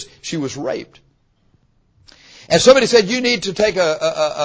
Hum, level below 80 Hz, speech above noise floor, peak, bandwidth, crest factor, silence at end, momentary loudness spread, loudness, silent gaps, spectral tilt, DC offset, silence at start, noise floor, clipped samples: none; -50 dBFS; 43 dB; 0 dBFS; 8 kHz; 18 dB; 0 s; 14 LU; -16 LUFS; none; -3.5 dB/octave; under 0.1%; 0 s; -59 dBFS; under 0.1%